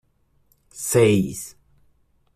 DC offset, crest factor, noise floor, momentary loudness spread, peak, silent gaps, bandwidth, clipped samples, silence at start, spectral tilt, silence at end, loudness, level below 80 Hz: under 0.1%; 20 dB; -63 dBFS; 18 LU; -4 dBFS; none; 15.5 kHz; under 0.1%; 0.75 s; -5.5 dB/octave; 0.85 s; -20 LUFS; -54 dBFS